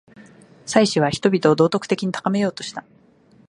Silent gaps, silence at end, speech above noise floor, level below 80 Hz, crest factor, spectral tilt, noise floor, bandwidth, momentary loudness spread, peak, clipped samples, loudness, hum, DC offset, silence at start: none; 0.7 s; 34 dB; -60 dBFS; 20 dB; -5.5 dB/octave; -53 dBFS; 11.5 kHz; 15 LU; 0 dBFS; under 0.1%; -19 LUFS; none; under 0.1%; 0.2 s